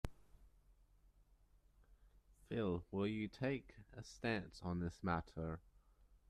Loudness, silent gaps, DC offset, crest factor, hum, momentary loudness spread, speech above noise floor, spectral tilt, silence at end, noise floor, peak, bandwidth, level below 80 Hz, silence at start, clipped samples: -44 LUFS; none; under 0.1%; 24 dB; none; 12 LU; 28 dB; -7 dB/octave; 0.15 s; -71 dBFS; -22 dBFS; 13 kHz; -62 dBFS; 0.05 s; under 0.1%